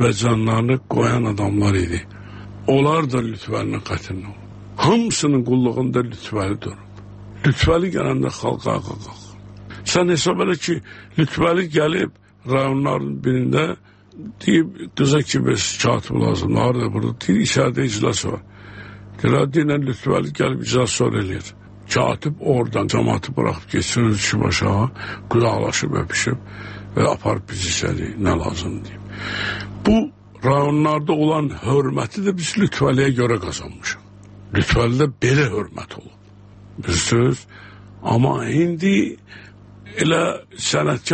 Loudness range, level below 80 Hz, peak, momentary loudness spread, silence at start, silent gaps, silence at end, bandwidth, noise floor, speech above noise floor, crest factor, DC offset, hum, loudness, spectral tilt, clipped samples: 3 LU; -42 dBFS; -4 dBFS; 14 LU; 0 s; none; 0 s; 8.8 kHz; -44 dBFS; 25 dB; 16 dB; under 0.1%; none; -20 LUFS; -5.5 dB/octave; under 0.1%